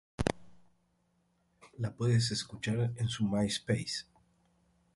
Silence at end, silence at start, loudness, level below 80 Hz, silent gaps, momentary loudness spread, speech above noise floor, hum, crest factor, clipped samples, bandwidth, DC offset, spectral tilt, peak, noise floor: 0.95 s; 0.2 s; -33 LUFS; -56 dBFS; none; 10 LU; 42 dB; none; 22 dB; under 0.1%; 11.5 kHz; under 0.1%; -5.5 dB/octave; -14 dBFS; -74 dBFS